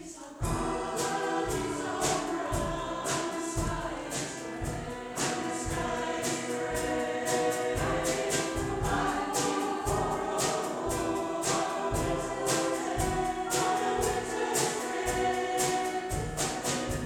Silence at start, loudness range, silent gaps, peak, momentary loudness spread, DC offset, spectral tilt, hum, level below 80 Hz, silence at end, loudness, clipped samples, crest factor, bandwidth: 0 s; 3 LU; none; -14 dBFS; 5 LU; under 0.1%; -3.5 dB/octave; none; -46 dBFS; 0 s; -31 LUFS; under 0.1%; 16 dB; 19.5 kHz